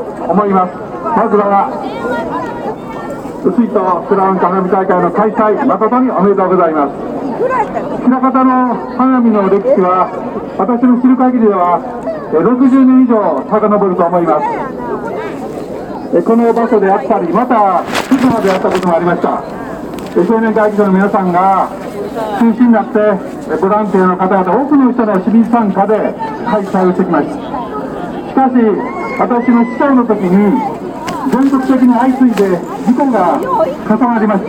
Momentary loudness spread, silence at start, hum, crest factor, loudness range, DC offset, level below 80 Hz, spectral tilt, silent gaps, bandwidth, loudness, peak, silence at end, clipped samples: 10 LU; 0 s; none; 12 dB; 3 LU; under 0.1%; -46 dBFS; -8 dB/octave; none; 10 kHz; -12 LUFS; 0 dBFS; 0 s; under 0.1%